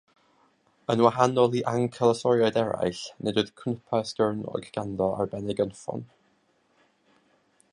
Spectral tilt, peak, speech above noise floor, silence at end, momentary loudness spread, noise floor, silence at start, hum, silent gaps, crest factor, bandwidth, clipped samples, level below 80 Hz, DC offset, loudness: -6 dB/octave; -4 dBFS; 42 dB; 1.65 s; 11 LU; -67 dBFS; 0.9 s; none; none; 22 dB; 11 kHz; under 0.1%; -62 dBFS; under 0.1%; -26 LUFS